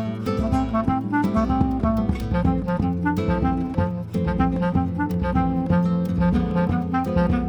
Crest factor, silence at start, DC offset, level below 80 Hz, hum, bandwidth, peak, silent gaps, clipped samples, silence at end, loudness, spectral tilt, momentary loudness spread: 14 dB; 0 s; under 0.1%; -32 dBFS; none; 8.2 kHz; -6 dBFS; none; under 0.1%; 0 s; -22 LUFS; -9 dB/octave; 3 LU